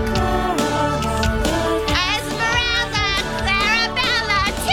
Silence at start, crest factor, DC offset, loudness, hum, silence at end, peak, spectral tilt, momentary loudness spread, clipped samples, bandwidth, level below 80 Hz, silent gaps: 0 s; 16 dB; under 0.1%; -18 LUFS; none; 0 s; -2 dBFS; -3.5 dB/octave; 3 LU; under 0.1%; 18 kHz; -30 dBFS; none